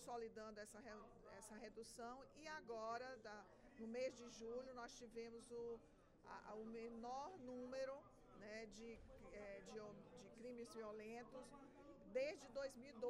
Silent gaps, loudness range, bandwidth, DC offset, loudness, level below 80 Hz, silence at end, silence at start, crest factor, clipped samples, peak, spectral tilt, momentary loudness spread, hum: none; 4 LU; 13 kHz; under 0.1%; -55 LUFS; -76 dBFS; 0 s; 0 s; 20 dB; under 0.1%; -36 dBFS; -4 dB/octave; 12 LU; none